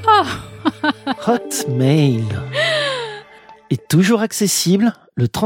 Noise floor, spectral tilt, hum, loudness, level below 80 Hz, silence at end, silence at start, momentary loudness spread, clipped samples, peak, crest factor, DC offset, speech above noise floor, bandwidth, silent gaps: -43 dBFS; -5 dB/octave; none; -17 LUFS; -52 dBFS; 0 s; 0 s; 10 LU; under 0.1%; 0 dBFS; 16 dB; under 0.1%; 27 dB; 16.5 kHz; none